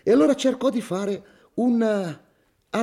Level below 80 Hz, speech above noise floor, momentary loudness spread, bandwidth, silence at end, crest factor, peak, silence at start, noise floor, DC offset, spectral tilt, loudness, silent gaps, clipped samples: -66 dBFS; 31 dB; 15 LU; 13.5 kHz; 0 s; 14 dB; -8 dBFS; 0.05 s; -52 dBFS; under 0.1%; -5.5 dB/octave; -23 LUFS; none; under 0.1%